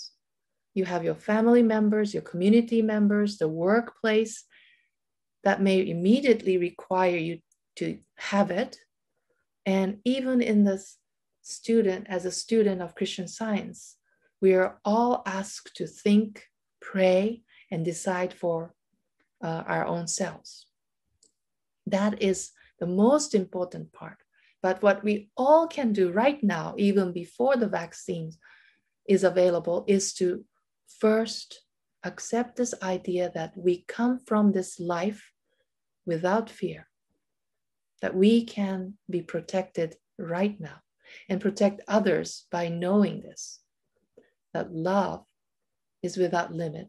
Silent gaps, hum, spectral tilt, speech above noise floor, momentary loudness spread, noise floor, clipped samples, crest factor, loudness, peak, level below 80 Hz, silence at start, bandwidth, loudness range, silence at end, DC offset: none; none; -5.5 dB/octave; 63 dB; 15 LU; -89 dBFS; under 0.1%; 20 dB; -26 LUFS; -6 dBFS; -70 dBFS; 0 s; 12 kHz; 6 LU; 0 s; under 0.1%